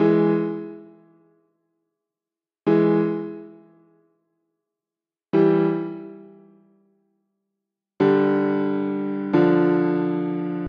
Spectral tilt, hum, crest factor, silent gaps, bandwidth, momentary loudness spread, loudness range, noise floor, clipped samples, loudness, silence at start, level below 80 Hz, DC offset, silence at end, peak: -10 dB/octave; none; 16 dB; none; 5.2 kHz; 15 LU; 5 LU; under -90 dBFS; under 0.1%; -21 LUFS; 0 s; -70 dBFS; under 0.1%; 0 s; -6 dBFS